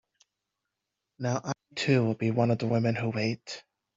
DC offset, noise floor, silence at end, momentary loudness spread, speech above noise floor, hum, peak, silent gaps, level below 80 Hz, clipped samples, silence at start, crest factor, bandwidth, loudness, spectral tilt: under 0.1%; -86 dBFS; 0.35 s; 11 LU; 58 dB; none; -10 dBFS; none; -68 dBFS; under 0.1%; 1.2 s; 20 dB; 7.8 kHz; -29 LUFS; -6.5 dB/octave